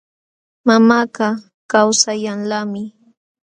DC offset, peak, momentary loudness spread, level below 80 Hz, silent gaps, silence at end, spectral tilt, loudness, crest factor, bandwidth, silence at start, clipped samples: under 0.1%; 0 dBFS; 15 LU; -62 dBFS; 1.54-1.69 s; 0.55 s; -3 dB/octave; -16 LUFS; 18 dB; 11 kHz; 0.65 s; under 0.1%